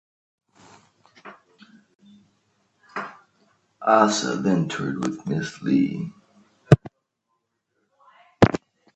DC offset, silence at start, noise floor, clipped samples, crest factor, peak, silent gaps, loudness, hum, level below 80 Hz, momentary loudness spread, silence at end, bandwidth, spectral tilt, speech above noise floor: under 0.1%; 1.25 s; -76 dBFS; under 0.1%; 26 dB; 0 dBFS; 1.95-1.99 s; -22 LUFS; none; -50 dBFS; 16 LU; 0.4 s; 9 kHz; -6 dB/octave; 54 dB